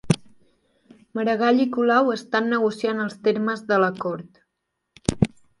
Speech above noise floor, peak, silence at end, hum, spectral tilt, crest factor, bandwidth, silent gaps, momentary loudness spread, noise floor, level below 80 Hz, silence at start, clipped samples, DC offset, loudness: 57 dB; -2 dBFS; 0.35 s; none; -6 dB/octave; 22 dB; 11.5 kHz; none; 10 LU; -78 dBFS; -50 dBFS; 0.05 s; under 0.1%; under 0.1%; -22 LUFS